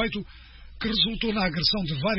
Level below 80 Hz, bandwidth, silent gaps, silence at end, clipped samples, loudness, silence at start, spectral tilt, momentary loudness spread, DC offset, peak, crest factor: -42 dBFS; 6 kHz; none; 0 s; under 0.1%; -25 LUFS; 0 s; -8.5 dB/octave; 11 LU; under 0.1%; -8 dBFS; 18 dB